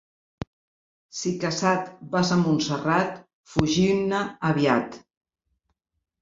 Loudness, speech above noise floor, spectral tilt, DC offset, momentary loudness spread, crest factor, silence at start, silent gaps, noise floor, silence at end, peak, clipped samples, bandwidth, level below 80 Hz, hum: -24 LUFS; 56 dB; -5.5 dB/octave; under 0.1%; 18 LU; 24 dB; 1.15 s; 3.33-3.44 s; -79 dBFS; 1.25 s; -2 dBFS; under 0.1%; 7.8 kHz; -54 dBFS; none